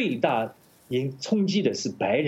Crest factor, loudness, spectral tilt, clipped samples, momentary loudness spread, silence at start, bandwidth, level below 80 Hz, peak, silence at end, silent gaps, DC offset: 18 dB; -26 LUFS; -5.5 dB/octave; under 0.1%; 6 LU; 0 s; 13.5 kHz; -70 dBFS; -8 dBFS; 0 s; none; under 0.1%